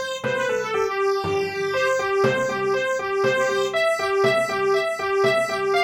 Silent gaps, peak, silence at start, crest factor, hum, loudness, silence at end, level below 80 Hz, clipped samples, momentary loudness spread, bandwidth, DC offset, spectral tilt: none; -6 dBFS; 0 s; 14 dB; none; -22 LUFS; 0 s; -60 dBFS; under 0.1%; 4 LU; 16 kHz; under 0.1%; -4 dB/octave